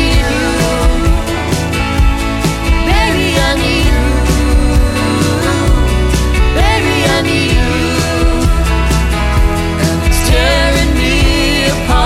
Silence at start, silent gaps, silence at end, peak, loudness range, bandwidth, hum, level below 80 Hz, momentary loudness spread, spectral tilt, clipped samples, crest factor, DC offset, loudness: 0 s; none; 0 s; 0 dBFS; 1 LU; 15.5 kHz; none; -14 dBFS; 3 LU; -5 dB/octave; under 0.1%; 10 dB; under 0.1%; -12 LUFS